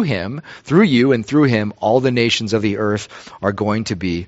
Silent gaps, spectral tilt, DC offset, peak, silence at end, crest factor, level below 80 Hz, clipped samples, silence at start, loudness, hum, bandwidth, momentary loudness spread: none; -5 dB/octave; under 0.1%; -2 dBFS; 0 s; 16 dB; -50 dBFS; under 0.1%; 0 s; -17 LUFS; none; 8 kHz; 10 LU